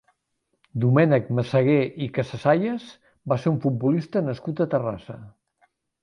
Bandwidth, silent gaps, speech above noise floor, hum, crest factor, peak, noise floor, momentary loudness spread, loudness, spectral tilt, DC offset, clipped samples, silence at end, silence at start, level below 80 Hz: 9.6 kHz; none; 53 dB; none; 18 dB; -6 dBFS; -75 dBFS; 15 LU; -23 LUFS; -9 dB/octave; under 0.1%; under 0.1%; 0.75 s; 0.75 s; -60 dBFS